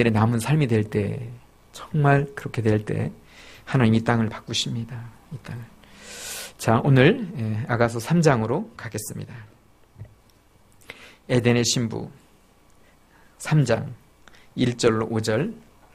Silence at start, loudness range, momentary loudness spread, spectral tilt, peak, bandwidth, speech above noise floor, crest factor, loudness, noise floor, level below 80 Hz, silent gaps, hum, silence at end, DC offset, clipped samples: 0 s; 5 LU; 20 LU; -6 dB/octave; -2 dBFS; 15.5 kHz; 34 dB; 20 dB; -23 LUFS; -56 dBFS; -52 dBFS; none; none; 0.35 s; under 0.1%; under 0.1%